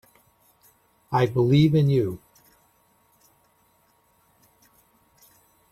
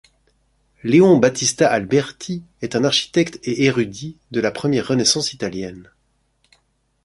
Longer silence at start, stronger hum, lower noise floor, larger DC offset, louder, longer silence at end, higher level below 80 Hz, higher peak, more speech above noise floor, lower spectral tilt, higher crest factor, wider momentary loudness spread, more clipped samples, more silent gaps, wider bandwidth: first, 1.1 s vs 0.85 s; neither; about the same, -64 dBFS vs -65 dBFS; neither; second, -21 LUFS vs -18 LUFS; first, 3.55 s vs 1.25 s; about the same, -58 dBFS vs -56 dBFS; second, -8 dBFS vs -2 dBFS; about the same, 44 dB vs 47 dB; first, -8.5 dB/octave vs -4 dB/octave; about the same, 20 dB vs 18 dB; second, 12 LU vs 16 LU; neither; neither; first, 14 kHz vs 11.5 kHz